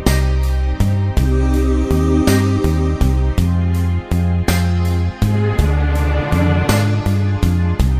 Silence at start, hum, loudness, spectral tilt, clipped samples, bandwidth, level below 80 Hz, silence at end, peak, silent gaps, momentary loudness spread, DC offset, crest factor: 0 s; none; -16 LUFS; -6.5 dB/octave; under 0.1%; 15.5 kHz; -20 dBFS; 0 s; 0 dBFS; none; 3 LU; under 0.1%; 14 dB